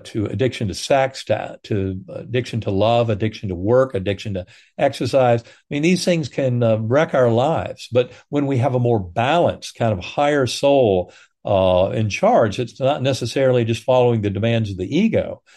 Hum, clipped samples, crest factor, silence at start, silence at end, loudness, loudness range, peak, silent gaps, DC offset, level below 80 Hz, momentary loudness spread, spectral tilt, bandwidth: none; under 0.1%; 16 dB; 0.05 s; 0.2 s; -19 LUFS; 3 LU; -2 dBFS; none; under 0.1%; -56 dBFS; 8 LU; -6.5 dB/octave; 12.5 kHz